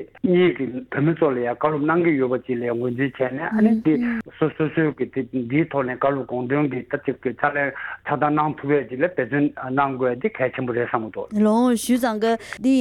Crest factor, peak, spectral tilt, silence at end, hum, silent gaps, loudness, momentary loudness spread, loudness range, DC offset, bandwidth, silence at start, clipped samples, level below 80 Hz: 18 dB; -4 dBFS; -7 dB/octave; 0 s; none; none; -22 LUFS; 7 LU; 2 LU; under 0.1%; 16.5 kHz; 0 s; under 0.1%; -58 dBFS